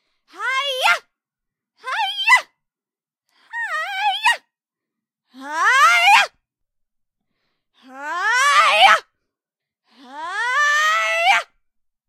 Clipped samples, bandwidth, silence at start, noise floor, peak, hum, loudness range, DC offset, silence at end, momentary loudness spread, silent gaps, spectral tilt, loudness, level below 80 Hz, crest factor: under 0.1%; 16 kHz; 0.35 s; under -90 dBFS; 0 dBFS; none; 5 LU; under 0.1%; 0.65 s; 16 LU; none; 2.5 dB/octave; -16 LUFS; -78 dBFS; 20 dB